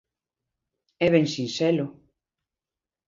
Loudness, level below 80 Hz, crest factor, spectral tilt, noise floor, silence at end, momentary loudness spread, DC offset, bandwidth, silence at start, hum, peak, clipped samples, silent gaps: -24 LUFS; -66 dBFS; 22 dB; -6 dB/octave; under -90 dBFS; 1.2 s; 7 LU; under 0.1%; 7.6 kHz; 1 s; none; -6 dBFS; under 0.1%; none